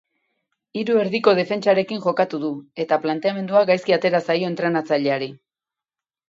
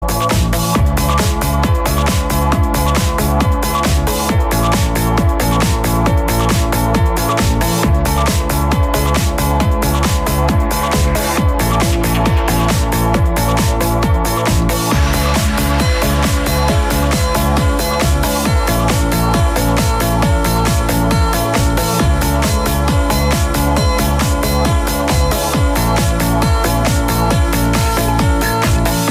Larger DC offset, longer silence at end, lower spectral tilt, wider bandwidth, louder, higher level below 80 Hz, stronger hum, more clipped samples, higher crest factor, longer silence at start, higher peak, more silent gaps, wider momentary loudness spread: neither; first, 0.95 s vs 0 s; first, -6.5 dB/octave vs -5 dB/octave; second, 7.8 kHz vs 16 kHz; second, -20 LUFS vs -14 LUFS; second, -72 dBFS vs -18 dBFS; neither; neither; first, 18 dB vs 10 dB; first, 0.75 s vs 0 s; about the same, -2 dBFS vs -2 dBFS; neither; first, 10 LU vs 1 LU